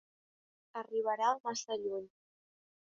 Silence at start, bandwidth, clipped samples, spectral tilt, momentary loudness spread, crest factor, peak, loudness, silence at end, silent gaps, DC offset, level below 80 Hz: 0.75 s; 7.4 kHz; under 0.1%; -1 dB/octave; 14 LU; 22 dB; -18 dBFS; -36 LUFS; 0.9 s; 1.40-1.44 s; under 0.1%; -88 dBFS